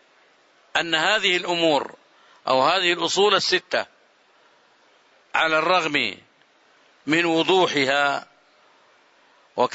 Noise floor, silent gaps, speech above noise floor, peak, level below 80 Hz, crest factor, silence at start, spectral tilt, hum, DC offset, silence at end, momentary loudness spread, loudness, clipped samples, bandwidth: -58 dBFS; none; 38 dB; -4 dBFS; -70 dBFS; 20 dB; 0.75 s; -3 dB/octave; none; under 0.1%; 0.05 s; 12 LU; -20 LUFS; under 0.1%; 8 kHz